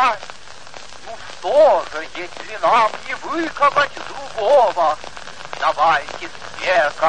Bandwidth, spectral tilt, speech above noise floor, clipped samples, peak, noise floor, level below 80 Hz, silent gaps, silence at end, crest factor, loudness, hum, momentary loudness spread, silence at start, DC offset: 9.8 kHz; -3 dB/octave; 21 dB; under 0.1%; -4 dBFS; -39 dBFS; -54 dBFS; none; 0 s; 16 dB; -18 LUFS; none; 20 LU; 0 s; 2%